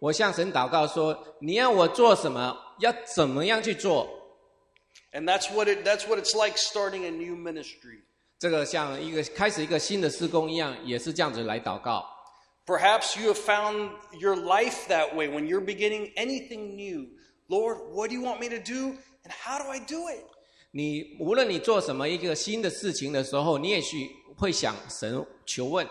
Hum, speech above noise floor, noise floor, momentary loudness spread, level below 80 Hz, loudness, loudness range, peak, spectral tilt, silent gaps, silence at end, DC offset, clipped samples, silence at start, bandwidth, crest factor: none; 38 dB; -65 dBFS; 12 LU; -62 dBFS; -27 LUFS; 8 LU; -4 dBFS; -3.5 dB/octave; none; 0 s; under 0.1%; under 0.1%; 0 s; 14 kHz; 22 dB